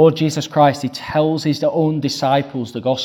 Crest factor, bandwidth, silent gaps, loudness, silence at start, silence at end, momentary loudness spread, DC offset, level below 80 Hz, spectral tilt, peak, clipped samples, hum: 16 dB; 16 kHz; none; -18 LUFS; 0 s; 0 s; 7 LU; under 0.1%; -54 dBFS; -6 dB/octave; 0 dBFS; under 0.1%; none